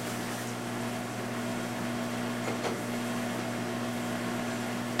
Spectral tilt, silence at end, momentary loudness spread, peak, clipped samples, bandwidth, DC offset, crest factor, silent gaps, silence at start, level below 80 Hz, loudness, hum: -4.5 dB/octave; 0 s; 2 LU; -12 dBFS; under 0.1%; 16 kHz; 0.1%; 20 dB; none; 0 s; -66 dBFS; -34 LUFS; none